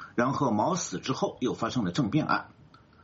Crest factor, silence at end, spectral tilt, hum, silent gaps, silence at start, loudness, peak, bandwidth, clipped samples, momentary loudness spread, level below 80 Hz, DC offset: 18 dB; 0.55 s; -5 dB/octave; none; none; 0 s; -29 LUFS; -12 dBFS; 8 kHz; under 0.1%; 4 LU; -62 dBFS; under 0.1%